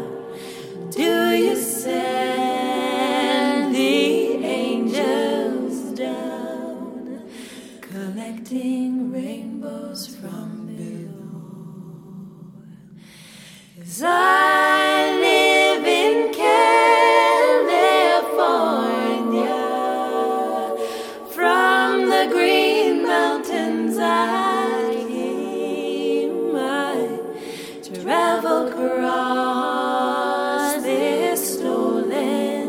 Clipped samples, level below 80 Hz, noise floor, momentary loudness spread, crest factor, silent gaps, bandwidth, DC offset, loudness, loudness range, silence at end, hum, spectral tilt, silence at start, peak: under 0.1%; -68 dBFS; -44 dBFS; 18 LU; 18 dB; none; 17 kHz; under 0.1%; -19 LUFS; 13 LU; 0 s; none; -3.5 dB/octave; 0 s; -2 dBFS